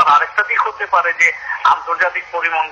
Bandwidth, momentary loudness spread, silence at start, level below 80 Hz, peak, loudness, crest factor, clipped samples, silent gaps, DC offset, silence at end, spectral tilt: 11 kHz; 5 LU; 0 s; -60 dBFS; -2 dBFS; -15 LUFS; 14 dB; under 0.1%; none; under 0.1%; 0 s; -0.5 dB/octave